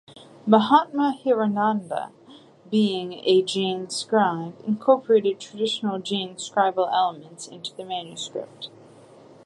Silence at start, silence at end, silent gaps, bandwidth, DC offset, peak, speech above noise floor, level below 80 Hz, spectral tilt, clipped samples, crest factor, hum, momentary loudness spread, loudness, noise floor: 0.1 s; 0.75 s; none; 11.5 kHz; under 0.1%; -2 dBFS; 26 dB; -76 dBFS; -5 dB/octave; under 0.1%; 22 dB; none; 16 LU; -23 LUFS; -49 dBFS